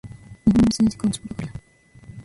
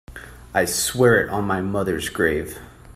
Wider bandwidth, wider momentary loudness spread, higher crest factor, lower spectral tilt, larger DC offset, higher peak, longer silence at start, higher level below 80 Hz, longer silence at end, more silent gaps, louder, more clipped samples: second, 11.5 kHz vs 16 kHz; about the same, 21 LU vs 20 LU; about the same, 16 dB vs 20 dB; first, -6 dB/octave vs -4 dB/octave; neither; second, -6 dBFS vs -2 dBFS; about the same, 0.05 s vs 0.1 s; about the same, -42 dBFS vs -44 dBFS; about the same, 0 s vs 0.05 s; neither; about the same, -20 LUFS vs -21 LUFS; neither